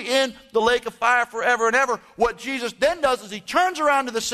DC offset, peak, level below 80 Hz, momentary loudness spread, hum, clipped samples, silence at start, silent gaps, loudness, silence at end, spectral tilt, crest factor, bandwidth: under 0.1%; -6 dBFS; -52 dBFS; 5 LU; none; under 0.1%; 0 s; none; -21 LUFS; 0 s; -2 dB/octave; 16 dB; 13.5 kHz